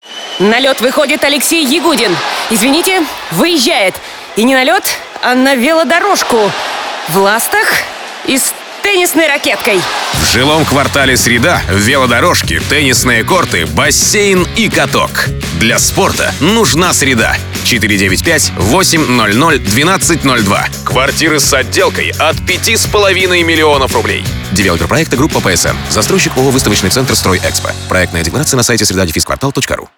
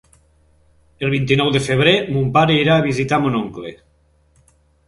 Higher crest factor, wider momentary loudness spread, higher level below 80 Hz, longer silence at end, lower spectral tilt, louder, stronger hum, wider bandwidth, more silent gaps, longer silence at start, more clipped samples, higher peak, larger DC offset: second, 10 dB vs 18 dB; second, 5 LU vs 11 LU; first, -30 dBFS vs -46 dBFS; second, 0.1 s vs 1.15 s; second, -3 dB/octave vs -6 dB/octave; first, -9 LUFS vs -16 LUFS; neither; first, over 20 kHz vs 11.5 kHz; neither; second, 0.05 s vs 1 s; neither; about the same, 0 dBFS vs 0 dBFS; first, 0.2% vs under 0.1%